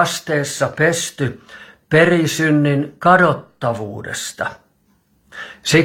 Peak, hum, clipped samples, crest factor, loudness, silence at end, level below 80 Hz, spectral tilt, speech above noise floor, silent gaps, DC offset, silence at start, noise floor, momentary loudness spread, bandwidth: 0 dBFS; none; under 0.1%; 18 dB; -17 LUFS; 0 s; -56 dBFS; -4.5 dB/octave; 43 dB; none; under 0.1%; 0 s; -59 dBFS; 14 LU; 19 kHz